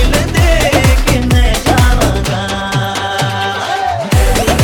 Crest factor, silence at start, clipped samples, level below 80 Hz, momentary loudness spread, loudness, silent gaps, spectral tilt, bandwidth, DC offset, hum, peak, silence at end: 10 dB; 0 s; under 0.1%; -16 dBFS; 6 LU; -12 LUFS; none; -4.5 dB/octave; over 20 kHz; under 0.1%; none; 0 dBFS; 0 s